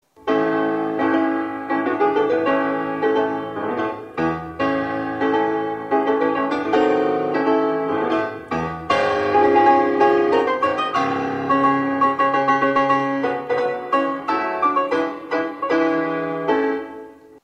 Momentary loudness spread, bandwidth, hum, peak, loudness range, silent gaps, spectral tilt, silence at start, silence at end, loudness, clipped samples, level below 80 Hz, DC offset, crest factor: 7 LU; 8.4 kHz; none; -4 dBFS; 4 LU; none; -6.5 dB/octave; 0.25 s; 0.3 s; -20 LUFS; under 0.1%; -56 dBFS; under 0.1%; 16 dB